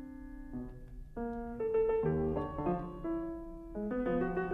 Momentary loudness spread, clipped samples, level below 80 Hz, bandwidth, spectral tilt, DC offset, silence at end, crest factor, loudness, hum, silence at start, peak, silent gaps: 16 LU; under 0.1%; -48 dBFS; 4.1 kHz; -10 dB/octave; under 0.1%; 0 s; 14 dB; -36 LUFS; none; 0 s; -22 dBFS; none